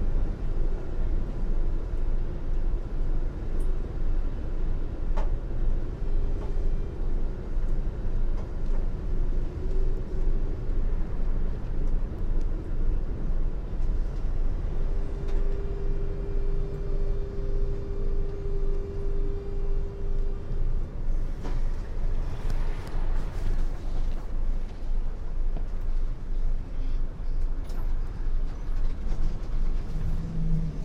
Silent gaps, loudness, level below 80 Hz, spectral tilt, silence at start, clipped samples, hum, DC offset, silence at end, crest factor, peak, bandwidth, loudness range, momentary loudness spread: none; -34 LUFS; -26 dBFS; -8.5 dB/octave; 0 s; under 0.1%; none; under 0.1%; 0 s; 12 dB; -14 dBFS; 2.9 kHz; 2 LU; 3 LU